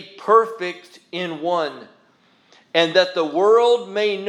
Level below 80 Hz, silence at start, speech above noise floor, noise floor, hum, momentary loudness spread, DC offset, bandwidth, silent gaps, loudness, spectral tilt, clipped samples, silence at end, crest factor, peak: -86 dBFS; 0 s; 39 dB; -57 dBFS; none; 14 LU; under 0.1%; 10.5 kHz; none; -19 LUFS; -4 dB/octave; under 0.1%; 0 s; 20 dB; 0 dBFS